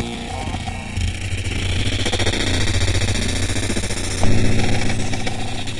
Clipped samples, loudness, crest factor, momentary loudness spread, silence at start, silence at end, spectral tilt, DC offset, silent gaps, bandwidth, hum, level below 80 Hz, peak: under 0.1%; -21 LUFS; 16 dB; 7 LU; 0 s; 0 s; -4 dB/octave; 5%; none; 11.5 kHz; none; -26 dBFS; -2 dBFS